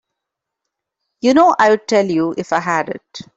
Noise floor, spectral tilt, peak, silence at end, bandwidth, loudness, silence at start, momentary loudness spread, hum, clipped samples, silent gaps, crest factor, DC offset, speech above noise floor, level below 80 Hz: -81 dBFS; -5 dB/octave; -2 dBFS; 0.15 s; 8 kHz; -15 LUFS; 1.25 s; 9 LU; none; under 0.1%; none; 14 dB; under 0.1%; 66 dB; -60 dBFS